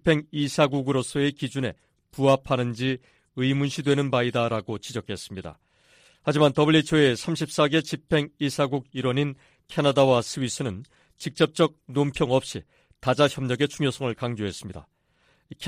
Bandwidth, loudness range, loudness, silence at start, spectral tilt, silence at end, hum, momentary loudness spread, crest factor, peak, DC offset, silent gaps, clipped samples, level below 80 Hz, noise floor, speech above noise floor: 15.5 kHz; 4 LU; -25 LUFS; 0.05 s; -5.5 dB/octave; 0 s; none; 14 LU; 18 dB; -8 dBFS; under 0.1%; none; under 0.1%; -56 dBFS; -65 dBFS; 41 dB